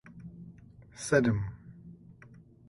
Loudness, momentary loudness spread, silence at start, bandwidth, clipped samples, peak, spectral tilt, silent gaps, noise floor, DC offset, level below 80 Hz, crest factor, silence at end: -30 LUFS; 26 LU; 0.05 s; 11.5 kHz; under 0.1%; -12 dBFS; -6 dB/octave; none; -55 dBFS; under 0.1%; -56 dBFS; 22 dB; 0.55 s